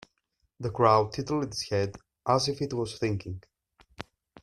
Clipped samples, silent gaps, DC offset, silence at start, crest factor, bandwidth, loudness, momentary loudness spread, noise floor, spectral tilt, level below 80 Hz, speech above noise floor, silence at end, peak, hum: under 0.1%; none; under 0.1%; 0.6 s; 22 dB; 12.5 kHz; -28 LUFS; 22 LU; -76 dBFS; -5.5 dB/octave; -58 dBFS; 49 dB; 0.4 s; -8 dBFS; none